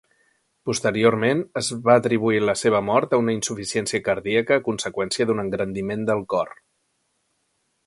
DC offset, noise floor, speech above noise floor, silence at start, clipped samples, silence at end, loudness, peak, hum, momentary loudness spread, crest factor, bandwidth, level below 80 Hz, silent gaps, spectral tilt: under 0.1%; -71 dBFS; 50 dB; 0.65 s; under 0.1%; 1.35 s; -22 LUFS; -2 dBFS; none; 8 LU; 20 dB; 11.5 kHz; -58 dBFS; none; -4.5 dB/octave